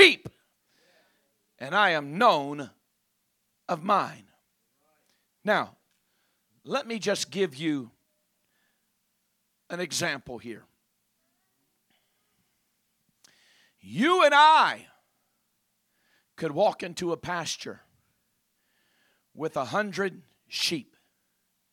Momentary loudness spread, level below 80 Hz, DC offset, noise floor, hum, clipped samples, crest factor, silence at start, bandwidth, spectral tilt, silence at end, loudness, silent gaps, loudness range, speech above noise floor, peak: 20 LU; -74 dBFS; under 0.1%; -76 dBFS; none; under 0.1%; 28 dB; 0 s; 17 kHz; -3 dB/octave; 0.9 s; -26 LUFS; none; 12 LU; 50 dB; -2 dBFS